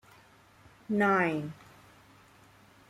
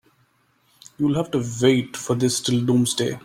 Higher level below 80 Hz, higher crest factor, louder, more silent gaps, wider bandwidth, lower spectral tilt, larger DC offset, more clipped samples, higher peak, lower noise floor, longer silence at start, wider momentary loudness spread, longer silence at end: second, -70 dBFS vs -58 dBFS; about the same, 20 dB vs 18 dB; second, -28 LUFS vs -21 LUFS; neither; second, 13.5 kHz vs 16 kHz; first, -7 dB/octave vs -5 dB/octave; neither; neither; second, -14 dBFS vs -4 dBFS; second, -59 dBFS vs -63 dBFS; about the same, 0.9 s vs 1 s; first, 19 LU vs 6 LU; first, 1.35 s vs 0.05 s